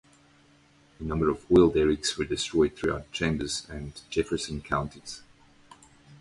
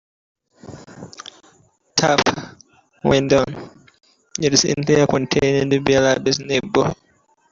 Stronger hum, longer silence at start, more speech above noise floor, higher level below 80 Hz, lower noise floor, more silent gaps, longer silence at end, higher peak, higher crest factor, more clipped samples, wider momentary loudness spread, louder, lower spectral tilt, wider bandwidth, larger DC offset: neither; first, 1 s vs 0.65 s; second, 33 dB vs 42 dB; about the same, -46 dBFS vs -48 dBFS; about the same, -60 dBFS vs -60 dBFS; neither; second, 0.05 s vs 0.55 s; second, -8 dBFS vs -2 dBFS; about the same, 22 dB vs 18 dB; neither; second, 18 LU vs 22 LU; second, -27 LUFS vs -18 LUFS; about the same, -5 dB/octave vs -4 dB/octave; first, 11.5 kHz vs 7.6 kHz; neither